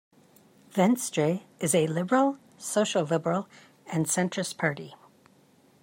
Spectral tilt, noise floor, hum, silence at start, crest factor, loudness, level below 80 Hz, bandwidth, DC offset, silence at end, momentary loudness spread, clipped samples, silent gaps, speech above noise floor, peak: -4.5 dB/octave; -61 dBFS; none; 0.75 s; 20 dB; -27 LUFS; -74 dBFS; 16 kHz; under 0.1%; 0.85 s; 9 LU; under 0.1%; none; 34 dB; -10 dBFS